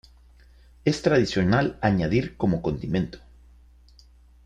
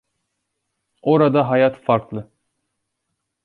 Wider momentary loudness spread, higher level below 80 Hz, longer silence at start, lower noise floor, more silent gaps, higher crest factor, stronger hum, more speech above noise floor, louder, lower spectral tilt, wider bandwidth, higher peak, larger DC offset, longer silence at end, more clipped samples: second, 7 LU vs 15 LU; first, -46 dBFS vs -62 dBFS; second, 0.85 s vs 1.05 s; second, -53 dBFS vs -77 dBFS; neither; about the same, 20 dB vs 18 dB; neither; second, 30 dB vs 60 dB; second, -24 LUFS vs -18 LUFS; second, -7 dB/octave vs -9.5 dB/octave; first, 9.8 kHz vs 4.7 kHz; second, -6 dBFS vs -2 dBFS; neither; about the same, 1.25 s vs 1.2 s; neither